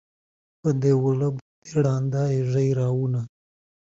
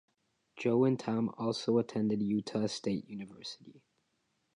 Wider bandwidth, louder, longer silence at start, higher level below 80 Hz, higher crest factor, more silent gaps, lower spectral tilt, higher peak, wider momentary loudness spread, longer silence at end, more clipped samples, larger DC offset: second, 7.8 kHz vs 11 kHz; first, -24 LUFS vs -33 LUFS; about the same, 0.65 s vs 0.55 s; first, -58 dBFS vs -74 dBFS; about the same, 16 dB vs 18 dB; first, 1.42-1.62 s vs none; first, -8.5 dB/octave vs -6.5 dB/octave; first, -8 dBFS vs -16 dBFS; second, 8 LU vs 16 LU; second, 0.7 s vs 0.85 s; neither; neither